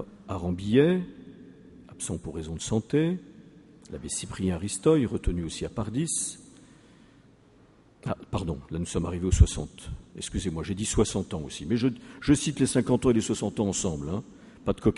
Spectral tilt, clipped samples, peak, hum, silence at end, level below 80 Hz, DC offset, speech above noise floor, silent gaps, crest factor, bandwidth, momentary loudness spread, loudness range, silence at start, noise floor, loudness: -5.5 dB/octave; under 0.1%; -4 dBFS; none; 0 s; -38 dBFS; under 0.1%; 30 dB; none; 24 dB; 11.5 kHz; 13 LU; 7 LU; 0 s; -57 dBFS; -28 LUFS